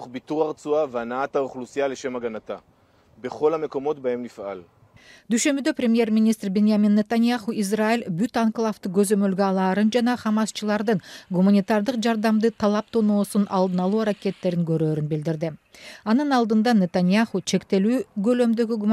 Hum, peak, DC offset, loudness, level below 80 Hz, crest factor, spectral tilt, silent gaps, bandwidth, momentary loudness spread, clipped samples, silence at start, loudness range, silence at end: none; -8 dBFS; under 0.1%; -22 LUFS; -66 dBFS; 14 dB; -6 dB/octave; none; 13.5 kHz; 10 LU; under 0.1%; 0 s; 6 LU; 0 s